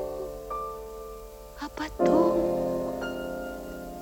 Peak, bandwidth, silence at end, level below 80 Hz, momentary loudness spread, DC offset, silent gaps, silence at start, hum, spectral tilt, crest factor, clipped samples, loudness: -10 dBFS; 18 kHz; 0 s; -48 dBFS; 18 LU; under 0.1%; none; 0 s; none; -6.5 dB/octave; 18 dB; under 0.1%; -29 LUFS